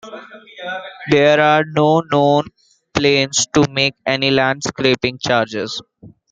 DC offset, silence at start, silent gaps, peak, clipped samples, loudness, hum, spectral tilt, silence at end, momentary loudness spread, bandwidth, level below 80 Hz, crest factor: under 0.1%; 0.05 s; none; 0 dBFS; under 0.1%; -16 LUFS; none; -4 dB/octave; 0.25 s; 15 LU; 9.6 kHz; -52 dBFS; 16 dB